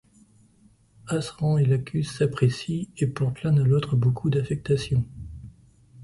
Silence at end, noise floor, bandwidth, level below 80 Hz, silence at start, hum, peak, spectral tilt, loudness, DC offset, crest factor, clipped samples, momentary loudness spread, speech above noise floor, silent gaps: 0 s; -58 dBFS; 11.5 kHz; -50 dBFS; 1.05 s; none; -8 dBFS; -7.5 dB/octave; -25 LUFS; under 0.1%; 18 dB; under 0.1%; 9 LU; 35 dB; none